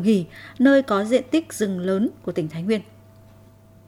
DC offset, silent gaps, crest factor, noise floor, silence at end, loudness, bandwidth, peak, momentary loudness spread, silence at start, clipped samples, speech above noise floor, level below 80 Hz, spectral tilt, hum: under 0.1%; none; 18 dB; -50 dBFS; 1.05 s; -22 LUFS; 15.5 kHz; -4 dBFS; 10 LU; 0 s; under 0.1%; 29 dB; -62 dBFS; -6 dB/octave; none